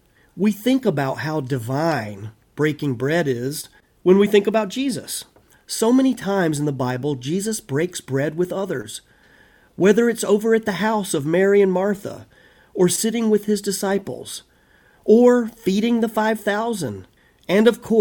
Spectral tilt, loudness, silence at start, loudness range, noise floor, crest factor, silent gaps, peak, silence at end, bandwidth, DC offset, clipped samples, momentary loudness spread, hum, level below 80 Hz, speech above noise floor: -5.5 dB/octave; -20 LUFS; 0.35 s; 4 LU; -55 dBFS; 18 dB; none; -2 dBFS; 0 s; 17.5 kHz; under 0.1%; under 0.1%; 14 LU; none; -60 dBFS; 36 dB